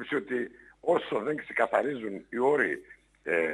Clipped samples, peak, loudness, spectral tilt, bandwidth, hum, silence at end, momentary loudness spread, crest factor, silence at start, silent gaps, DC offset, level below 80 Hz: under 0.1%; -10 dBFS; -29 LUFS; -6 dB/octave; 11 kHz; none; 0 s; 11 LU; 20 dB; 0 s; none; under 0.1%; -70 dBFS